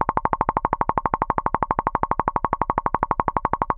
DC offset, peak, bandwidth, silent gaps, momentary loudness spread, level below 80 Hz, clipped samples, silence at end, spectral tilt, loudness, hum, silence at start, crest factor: under 0.1%; -4 dBFS; 4.2 kHz; none; 1 LU; -38 dBFS; under 0.1%; 0 s; -11 dB/octave; -23 LUFS; none; 0 s; 20 dB